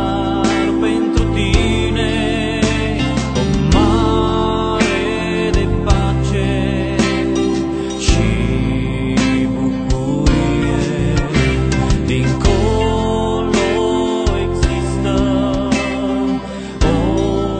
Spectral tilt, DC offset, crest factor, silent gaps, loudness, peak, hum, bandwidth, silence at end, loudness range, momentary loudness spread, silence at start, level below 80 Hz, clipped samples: -6 dB/octave; under 0.1%; 16 dB; none; -16 LUFS; 0 dBFS; none; 9.2 kHz; 0 s; 1 LU; 3 LU; 0 s; -22 dBFS; under 0.1%